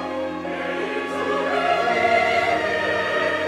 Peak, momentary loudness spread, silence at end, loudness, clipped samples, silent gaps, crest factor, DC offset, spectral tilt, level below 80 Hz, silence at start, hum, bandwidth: -6 dBFS; 9 LU; 0 s; -21 LUFS; under 0.1%; none; 16 dB; under 0.1%; -4 dB/octave; -60 dBFS; 0 s; none; 14 kHz